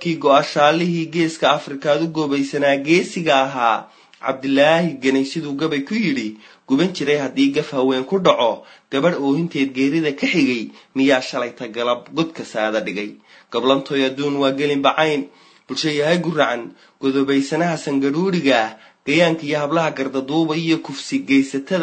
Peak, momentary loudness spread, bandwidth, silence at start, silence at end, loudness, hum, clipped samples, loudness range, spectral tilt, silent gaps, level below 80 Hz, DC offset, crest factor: 0 dBFS; 9 LU; 9 kHz; 0 s; 0 s; -19 LUFS; none; under 0.1%; 2 LU; -5.5 dB/octave; none; -68 dBFS; under 0.1%; 18 dB